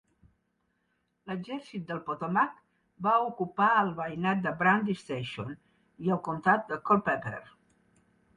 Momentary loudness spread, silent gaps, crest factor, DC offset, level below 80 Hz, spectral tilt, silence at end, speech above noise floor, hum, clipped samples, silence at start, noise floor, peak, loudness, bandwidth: 14 LU; none; 20 dB; under 0.1%; -68 dBFS; -7 dB/octave; 0.9 s; 47 dB; none; under 0.1%; 1.25 s; -76 dBFS; -10 dBFS; -29 LUFS; 10.5 kHz